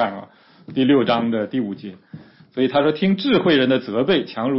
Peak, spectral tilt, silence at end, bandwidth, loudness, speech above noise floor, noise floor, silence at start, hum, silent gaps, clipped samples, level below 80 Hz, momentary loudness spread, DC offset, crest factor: -4 dBFS; -10.5 dB/octave; 0 s; 5.8 kHz; -19 LUFS; 22 dB; -40 dBFS; 0 s; none; none; under 0.1%; -60 dBFS; 14 LU; under 0.1%; 16 dB